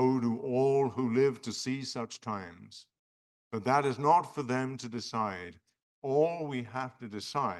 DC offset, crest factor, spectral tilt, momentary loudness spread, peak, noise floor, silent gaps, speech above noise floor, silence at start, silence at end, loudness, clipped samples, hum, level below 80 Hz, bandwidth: under 0.1%; 18 dB; -6 dB/octave; 14 LU; -12 dBFS; under -90 dBFS; 2.99-3.51 s, 5.82-6.02 s; over 58 dB; 0 s; 0 s; -31 LUFS; under 0.1%; none; -78 dBFS; 12 kHz